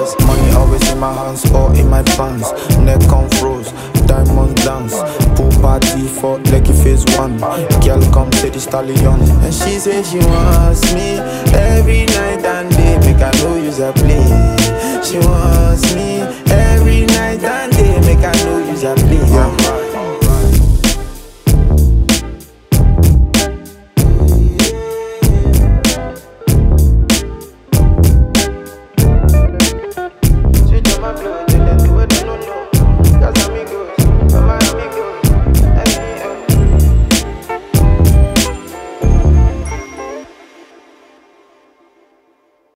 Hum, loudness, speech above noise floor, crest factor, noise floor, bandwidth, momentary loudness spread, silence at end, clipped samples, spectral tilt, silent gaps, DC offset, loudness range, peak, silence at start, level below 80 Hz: none; -12 LUFS; 45 dB; 10 dB; -55 dBFS; 16.5 kHz; 9 LU; 2.5 s; under 0.1%; -5.5 dB/octave; none; under 0.1%; 2 LU; 0 dBFS; 0 s; -14 dBFS